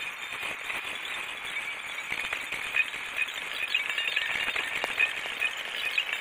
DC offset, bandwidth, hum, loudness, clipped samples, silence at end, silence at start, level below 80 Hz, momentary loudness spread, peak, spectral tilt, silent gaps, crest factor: under 0.1%; over 20 kHz; none; -29 LUFS; under 0.1%; 0 s; 0 s; -66 dBFS; 7 LU; -10 dBFS; 0 dB/octave; none; 22 dB